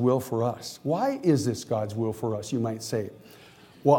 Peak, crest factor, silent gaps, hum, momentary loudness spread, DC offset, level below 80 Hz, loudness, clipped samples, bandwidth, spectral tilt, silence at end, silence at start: -6 dBFS; 20 dB; none; none; 7 LU; under 0.1%; -66 dBFS; -28 LUFS; under 0.1%; 17.5 kHz; -6.5 dB/octave; 0 s; 0 s